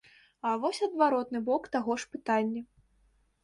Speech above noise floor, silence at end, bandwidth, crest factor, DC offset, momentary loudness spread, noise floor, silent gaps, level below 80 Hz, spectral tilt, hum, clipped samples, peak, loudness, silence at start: 39 dB; 0.8 s; 11.5 kHz; 20 dB; under 0.1%; 8 LU; -68 dBFS; none; -70 dBFS; -4.5 dB/octave; none; under 0.1%; -12 dBFS; -30 LUFS; 0.45 s